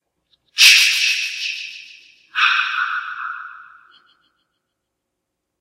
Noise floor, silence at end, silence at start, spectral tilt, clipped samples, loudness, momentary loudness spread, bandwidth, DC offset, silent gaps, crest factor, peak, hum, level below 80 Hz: -78 dBFS; 2 s; 0.55 s; 6.5 dB/octave; under 0.1%; -14 LUFS; 23 LU; 16 kHz; under 0.1%; none; 20 dB; 0 dBFS; none; -76 dBFS